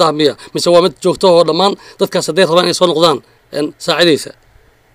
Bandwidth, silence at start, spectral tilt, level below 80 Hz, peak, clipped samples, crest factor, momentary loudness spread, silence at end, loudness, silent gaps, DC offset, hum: 16 kHz; 0 s; -4 dB/octave; -52 dBFS; 0 dBFS; 0.2%; 12 dB; 10 LU; 0.65 s; -12 LUFS; none; under 0.1%; none